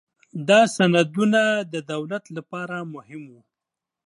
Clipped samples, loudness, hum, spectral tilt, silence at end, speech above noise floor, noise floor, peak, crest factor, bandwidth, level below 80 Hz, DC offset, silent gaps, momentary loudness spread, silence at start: under 0.1%; -21 LUFS; none; -5 dB/octave; 0.8 s; 65 dB; -87 dBFS; -4 dBFS; 20 dB; 11.5 kHz; -72 dBFS; under 0.1%; none; 21 LU; 0.35 s